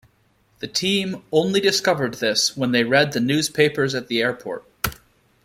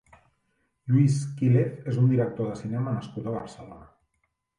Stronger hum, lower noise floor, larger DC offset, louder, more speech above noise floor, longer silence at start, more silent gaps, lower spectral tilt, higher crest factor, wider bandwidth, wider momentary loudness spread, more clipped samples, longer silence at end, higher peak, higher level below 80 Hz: neither; second, -62 dBFS vs -76 dBFS; neither; first, -20 LUFS vs -26 LUFS; second, 41 dB vs 51 dB; second, 0.6 s vs 0.85 s; neither; second, -3.5 dB/octave vs -8.5 dB/octave; about the same, 18 dB vs 16 dB; first, 16.5 kHz vs 10 kHz; second, 10 LU vs 19 LU; neither; second, 0.5 s vs 0.75 s; first, -4 dBFS vs -10 dBFS; first, -52 dBFS vs -60 dBFS